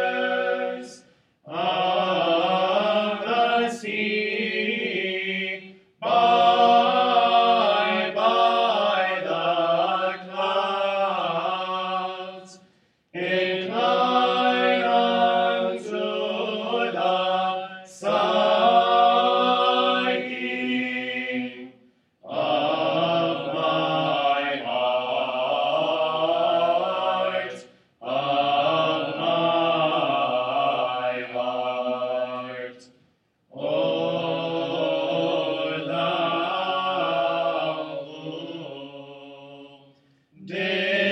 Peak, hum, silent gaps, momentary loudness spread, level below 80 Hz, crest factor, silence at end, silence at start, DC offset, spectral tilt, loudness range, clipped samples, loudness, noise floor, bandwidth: -6 dBFS; none; none; 13 LU; -76 dBFS; 16 dB; 0 s; 0 s; under 0.1%; -5 dB/octave; 7 LU; under 0.1%; -23 LUFS; -65 dBFS; 9.4 kHz